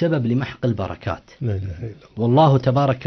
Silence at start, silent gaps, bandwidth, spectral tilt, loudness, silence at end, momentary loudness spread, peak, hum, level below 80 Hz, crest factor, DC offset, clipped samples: 0 s; none; 6.4 kHz; -9 dB/octave; -20 LUFS; 0 s; 15 LU; -2 dBFS; none; -48 dBFS; 16 dB; under 0.1%; under 0.1%